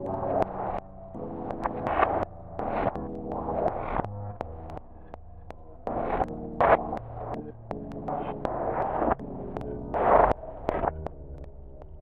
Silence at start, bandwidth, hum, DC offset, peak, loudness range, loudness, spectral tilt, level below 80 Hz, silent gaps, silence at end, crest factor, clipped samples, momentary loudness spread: 0 s; 7 kHz; none; under 0.1%; -6 dBFS; 6 LU; -29 LUFS; -9 dB/octave; -44 dBFS; none; 0 s; 22 dB; under 0.1%; 21 LU